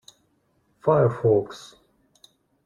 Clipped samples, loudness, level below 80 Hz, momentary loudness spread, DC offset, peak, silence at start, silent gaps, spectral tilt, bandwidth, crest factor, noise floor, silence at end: under 0.1%; -22 LUFS; -60 dBFS; 18 LU; under 0.1%; -6 dBFS; 0.85 s; none; -8 dB/octave; 11 kHz; 20 dB; -67 dBFS; 1.1 s